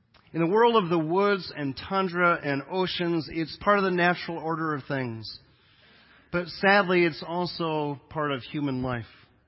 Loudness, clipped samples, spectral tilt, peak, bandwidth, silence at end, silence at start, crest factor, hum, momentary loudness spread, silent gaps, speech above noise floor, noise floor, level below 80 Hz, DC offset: -26 LUFS; under 0.1%; -10 dB/octave; -8 dBFS; 5.8 kHz; 0.4 s; 0.35 s; 20 dB; none; 12 LU; none; 33 dB; -59 dBFS; -58 dBFS; under 0.1%